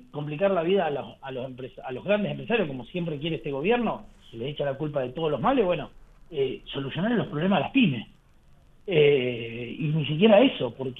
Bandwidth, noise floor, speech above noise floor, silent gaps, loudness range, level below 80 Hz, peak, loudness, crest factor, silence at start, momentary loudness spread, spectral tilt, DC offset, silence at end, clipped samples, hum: 4 kHz; -55 dBFS; 30 dB; none; 5 LU; -54 dBFS; -6 dBFS; -26 LUFS; 20 dB; 0.15 s; 16 LU; -9 dB/octave; under 0.1%; 0 s; under 0.1%; none